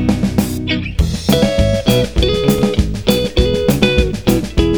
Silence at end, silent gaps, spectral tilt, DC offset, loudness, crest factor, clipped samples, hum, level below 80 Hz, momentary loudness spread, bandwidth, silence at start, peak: 0 s; none; -6 dB/octave; 2%; -15 LUFS; 14 dB; 0.1%; none; -22 dBFS; 4 LU; over 20 kHz; 0 s; 0 dBFS